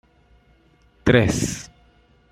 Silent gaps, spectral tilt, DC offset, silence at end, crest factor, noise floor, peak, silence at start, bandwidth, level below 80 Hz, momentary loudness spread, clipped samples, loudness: none; -5 dB/octave; under 0.1%; 0.65 s; 22 dB; -57 dBFS; -2 dBFS; 1.05 s; 15.5 kHz; -42 dBFS; 18 LU; under 0.1%; -20 LUFS